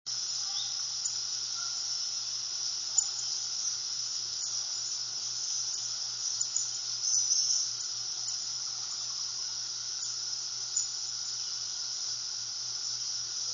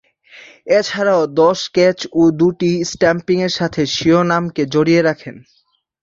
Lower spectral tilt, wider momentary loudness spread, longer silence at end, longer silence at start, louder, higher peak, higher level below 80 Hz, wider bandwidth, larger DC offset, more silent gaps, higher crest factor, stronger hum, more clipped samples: second, 3 dB/octave vs -5.5 dB/octave; about the same, 5 LU vs 5 LU; second, 0 s vs 0.65 s; second, 0.05 s vs 0.35 s; second, -31 LUFS vs -15 LUFS; second, -12 dBFS vs -2 dBFS; second, -76 dBFS vs -52 dBFS; about the same, 7.6 kHz vs 7.6 kHz; neither; neither; first, 22 dB vs 14 dB; neither; neither